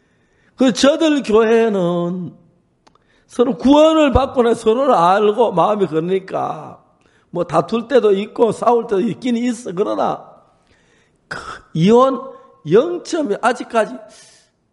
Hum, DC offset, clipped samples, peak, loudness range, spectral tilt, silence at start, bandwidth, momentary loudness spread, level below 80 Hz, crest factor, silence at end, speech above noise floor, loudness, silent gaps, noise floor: none; under 0.1%; under 0.1%; 0 dBFS; 5 LU; -6 dB/octave; 0.6 s; 11.5 kHz; 16 LU; -42 dBFS; 16 dB; 0.7 s; 42 dB; -16 LUFS; none; -57 dBFS